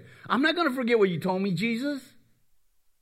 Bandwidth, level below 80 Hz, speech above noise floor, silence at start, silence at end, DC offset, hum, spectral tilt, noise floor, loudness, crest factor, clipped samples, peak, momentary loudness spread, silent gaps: 15 kHz; -74 dBFS; 38 dB; 0.25 s; 1 s; under 0.1%; none; -6 dB/octave; -64 dBFS; -26 LUFS; 18 dB; under 0.1%; -10 dBFS; 7 LU; none